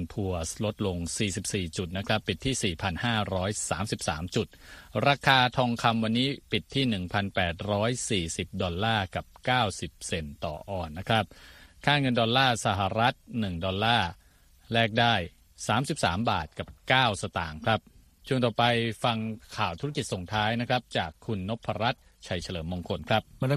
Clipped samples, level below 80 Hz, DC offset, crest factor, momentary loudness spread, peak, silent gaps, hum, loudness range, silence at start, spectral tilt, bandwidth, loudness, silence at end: under 0.1%; -50 dBFS; under 0.1%; 22 dB; 11 LU; -6 dBFS; none; none; 4 LU; 0 s; -4.5 dB/octave; 14.5 kHz; -28 LUFS; 0 s